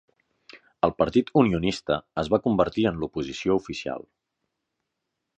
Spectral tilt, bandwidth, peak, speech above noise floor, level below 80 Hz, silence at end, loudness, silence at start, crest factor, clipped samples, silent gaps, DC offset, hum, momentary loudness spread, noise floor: -6.5 dB/octave; 9 kHz; -4 dBFS; 58 dB; -50 dBFS; 1.4 s; -25 LUFS; 0.55 s; 22 dB; under 0.1%; none; under 0.1%; none; 10 LU; -82 dBFS